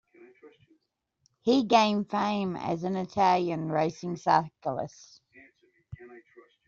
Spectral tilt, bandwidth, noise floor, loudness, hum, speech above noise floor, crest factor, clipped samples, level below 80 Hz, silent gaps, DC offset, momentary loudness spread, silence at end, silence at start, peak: -4.5 dB/octave; 7.4 kHz; -78 dBFS; -27 LUFS; none; 51 dB; 20 dB; under 0.1%; -66 dBFS; none; under 0.1%; 14 LU; 0.5 s; 0.45 s; -8 dBFS